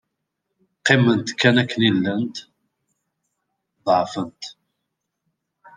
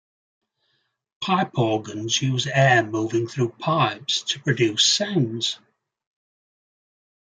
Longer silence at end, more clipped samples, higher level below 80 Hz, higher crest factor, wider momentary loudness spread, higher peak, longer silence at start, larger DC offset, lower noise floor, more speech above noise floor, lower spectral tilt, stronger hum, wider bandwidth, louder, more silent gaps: second, 1.25 s vs 1.8 s; neither; about the same, -66 dBFS vs -66 dBFS; about the same, 22 dB vs 20 dB; first, 16 LU vs 9 LU; about the same, -2 dBFS vs -4 dBFS; second, 0.85 s vs 1.2 s; neither; first, -79 dBFS vs -72 dBFS; first, 60 dB vs 50 dB; first, -5.5 dB/octave vs -4 dB/octave; neither; about the same, 9.8 kHz vs 9.6 kHz; about the same, -19 LUFS vs -21 LUFS; neither